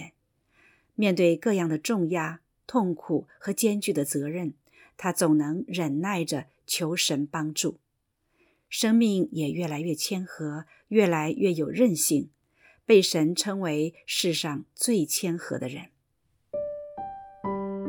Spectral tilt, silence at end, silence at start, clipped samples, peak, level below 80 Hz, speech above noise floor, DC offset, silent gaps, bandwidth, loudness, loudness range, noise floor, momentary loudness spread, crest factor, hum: -4.5 dB/octave; 0 s; 0 s; under 0.1%; -8 dBFS; -70 dBFS; 50 dB; under 0.1%; none; 19 kHz; -26 LUFS; 4 LU; -76 dBFS; 13 LU; 20 dB; none